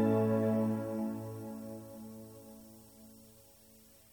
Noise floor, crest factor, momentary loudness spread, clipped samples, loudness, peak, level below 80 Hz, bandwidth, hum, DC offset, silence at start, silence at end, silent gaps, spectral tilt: -60 dBFS; 18 dB; 25 LU; under 0.1%; -35 LUFS; -18 dBFS; -72 dBFS; over 20 kHz; none; under 0.1%; 0 s; 0.7 s; none; -8.5 dB/octave